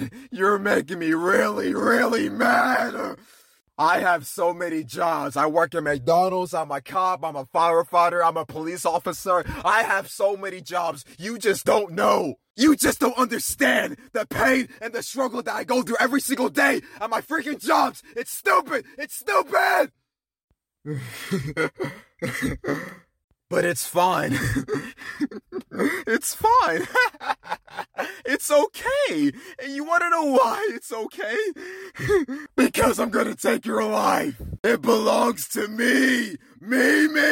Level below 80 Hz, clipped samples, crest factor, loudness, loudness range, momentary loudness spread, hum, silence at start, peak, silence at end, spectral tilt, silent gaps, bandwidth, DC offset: -52 dBFS; under 0.1%; 18 dB; -23 LUFS; 4 LU; 12 LU; none; 0 s; -6 dBFS; 0 s; -4 dB/octave; 12.50-12.54 s, 20.44-20.48 s, 23.24-23.28 s, 34.59-34.64 s; 17 kHz; under 0.1%